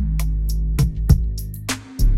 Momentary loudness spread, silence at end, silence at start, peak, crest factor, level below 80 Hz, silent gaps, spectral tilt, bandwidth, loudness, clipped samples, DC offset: 9 LU; 0 s; 0 s; -2 dBFS; 18 dB; -20 dBFS; none; -5.5 dB/octave; 16 kHz; -22 LUFS; under 0.1%; under 0.1%